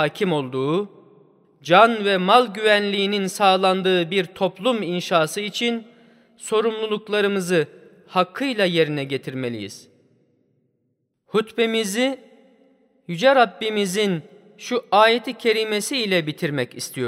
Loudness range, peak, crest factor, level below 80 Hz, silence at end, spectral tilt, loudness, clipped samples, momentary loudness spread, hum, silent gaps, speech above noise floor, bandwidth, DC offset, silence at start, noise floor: 8 LU; -2 dBFS; 20 dB; -74 dBFS; 0 s; -4.5 dB/octave; -20 LUFS; under 0.1%; 12 LU; none; none; 51 dB; 16 kHz; under 0.1%; 0 s; -72 dBFS